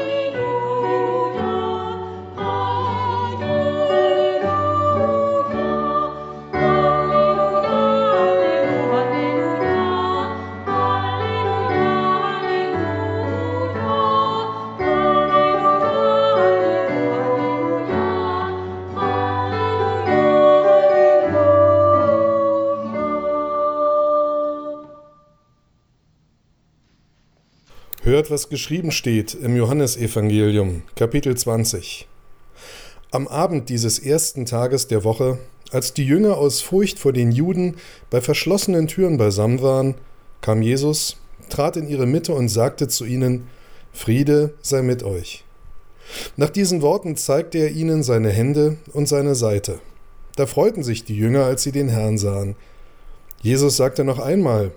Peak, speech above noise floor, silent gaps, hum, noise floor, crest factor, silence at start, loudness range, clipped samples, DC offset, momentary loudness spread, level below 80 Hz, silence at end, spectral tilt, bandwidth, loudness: -4 dBFS; 41 dB; none; none; -60 dBFS; 16 dB; 0 s; 6 LU; under 0.1%; under 0.1%; 9 LU; -44 dBFS; 0 s; -5.5 dB/octave; over 20 kHz; -19 LUFS